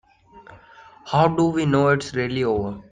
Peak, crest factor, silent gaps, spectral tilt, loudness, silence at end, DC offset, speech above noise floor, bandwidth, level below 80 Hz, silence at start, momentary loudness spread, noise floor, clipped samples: -4 dBFS; 18 dB; none; -6.5 dB/octave; -21 LUFS; 0.1 s; under 0.1%; 28 dB; 9.6 kHz; -52 dBFS; 0.35 s; 6 LU; -48 dBFS; under 0.1%